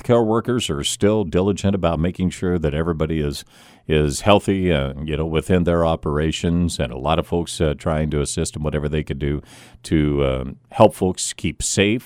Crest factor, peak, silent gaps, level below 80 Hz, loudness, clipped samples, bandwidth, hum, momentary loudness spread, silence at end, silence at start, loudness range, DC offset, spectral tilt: 20 dB; 0 dBFS; none; -34 dBFS; -20 LUFS; under 0.1%; 16 kHz; none; 8 LU; 0 s; 0.05 s; 3 LU; under 0.1%; -5.5 dB/octave